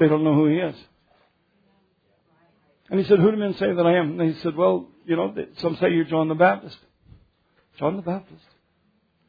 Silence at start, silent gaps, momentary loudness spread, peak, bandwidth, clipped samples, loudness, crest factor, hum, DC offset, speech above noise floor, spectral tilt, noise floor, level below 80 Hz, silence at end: 0 s; none; 11 LU; -4 dBFS; 5 kHz; under 0.1%; -22 LUFS; 18 dB; none; under 0.1%; 45 dB; -9.5 dB/octave; -66 dBFS; -64 dBFS; 0.95 s